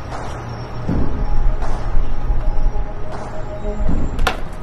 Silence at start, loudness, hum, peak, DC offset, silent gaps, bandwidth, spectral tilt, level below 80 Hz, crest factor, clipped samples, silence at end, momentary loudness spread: 0 s; -25 LUFS; none; -2 dBFS; under 0.1%; none; 7.8 kHz; -6.5 dB/octave; -18 dBFS; 12 dB; under 0.1%; 0 s; 7 LU